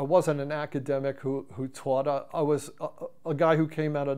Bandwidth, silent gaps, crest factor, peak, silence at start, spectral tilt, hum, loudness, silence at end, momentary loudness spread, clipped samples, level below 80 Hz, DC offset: 15.5 kHz; none; 18 dB; -10 dBFS; 0 s; -7 dB/octave; none; -29 LUFS; 0 s; 13 LU; under 0.1%; -72 dBFS; 0.3%